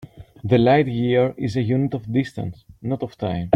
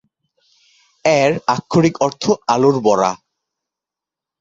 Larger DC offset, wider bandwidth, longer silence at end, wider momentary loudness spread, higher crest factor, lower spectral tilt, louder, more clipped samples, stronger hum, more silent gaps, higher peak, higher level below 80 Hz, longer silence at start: neither; first, 9 kHz vs 7.8 kHz; second, 0 s vs 1.25 s; first, 15 LU vs 6 LU; about the same, 18 dB vs 18 dB; first, -8.5 dB/octave vs -5.5 dB/octave; second, -21 LUFS vs -16 LUFS; neither; neither; neither; about the same, -2 dBFS vs 0 dBFS; first, -50 dBFS vs -56 dBFS; second, 0 s vs 1.05 s